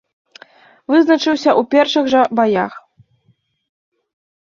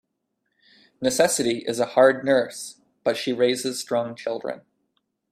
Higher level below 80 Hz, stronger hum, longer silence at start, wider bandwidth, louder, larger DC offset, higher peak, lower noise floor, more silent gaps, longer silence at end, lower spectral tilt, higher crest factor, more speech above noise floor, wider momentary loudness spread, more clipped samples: first, -62 dBFS vs -68 dBFS; neither; about the same, 0.9 s vs 1 s; second, 7.2 kHz vs 15 kHz; first, -14 LUFS vs -23 LUFS; neither; about the same, -2 dBFS vs -4 dBFS; second, -60 dBFS vs -76 dBFS; neither; first, 1.65 s vs 0.7 s; first, -4.5 dB/octave vs -3 dB/octave; second, 16 dB vs 22 dB; second, 47 dB vs 54 dB; second, 6 LU vs 14 LU; neither